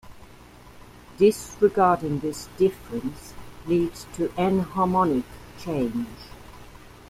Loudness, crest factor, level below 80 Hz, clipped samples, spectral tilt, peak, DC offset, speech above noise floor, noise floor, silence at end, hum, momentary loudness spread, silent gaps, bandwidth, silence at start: -24 LUFS; 18 dB; -50 dBFS; under 0.1%; -6.5 dB/octave; -6 dBFS; under 0.1%; 24 dB; -47 dBFS; 0.2 s; none; 20 LU; none; 15.5 kHz; 0.05 s